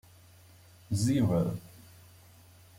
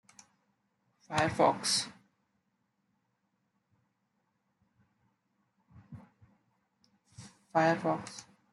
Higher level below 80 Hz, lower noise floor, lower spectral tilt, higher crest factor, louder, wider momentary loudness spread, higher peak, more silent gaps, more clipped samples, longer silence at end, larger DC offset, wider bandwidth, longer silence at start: first, -60 dBFS vs -74 dBFS; second, -56 dBFS vs -79 dBFS; first, -7 dB/octave vs -3.5 dB/octave; second, 16 dB vs 24 dB; about the same, -30 LUFS vs -30 LUFS; second, 16 LU vs 19 LU; second, -18 dBFS vs -14 dBFS; neither; neither; first, 1.1 s vs 0.3 s; neither; first, 16.5 kHz vs 11.5 kHz; second, 0.9 s vs 1.1 s